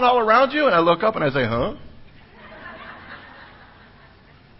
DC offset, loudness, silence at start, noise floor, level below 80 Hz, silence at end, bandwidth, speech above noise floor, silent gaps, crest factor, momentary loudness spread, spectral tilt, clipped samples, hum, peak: under 0.1%; -18 LUFS; 0 s; -49 dBFS; -48 dBFS; 1.15 s; 5.8 kHz; 31 dB; none; 20 dB; 24 LU; -10 dB/octave; under 0.1%; none; -2 dBFS